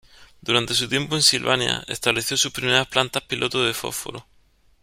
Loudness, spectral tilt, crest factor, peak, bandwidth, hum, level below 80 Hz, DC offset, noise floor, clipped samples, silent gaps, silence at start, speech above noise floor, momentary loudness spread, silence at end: -21 LUFS; -2 dB/octave; 22 dB; -2 dBFS; 16 kHz; none; -54 dBFS; under 0.1%; -58 dBFS; under 0.1%; none; 0.2 s; 35 dB; 12 LU; 0.6 s